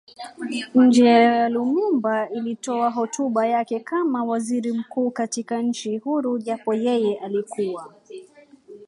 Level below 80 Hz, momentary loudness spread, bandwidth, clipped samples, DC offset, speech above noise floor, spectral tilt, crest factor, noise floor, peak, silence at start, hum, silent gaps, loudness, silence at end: -76 dBFS; 13 LU; 11 kHz; under 0.1%; under 0.1%; 28 dB; -4.5 dB/octave; 18 dB; -49 dBFS; -4 dBFS; 0.2 s; none; none; -22 LUFS; 0.05 s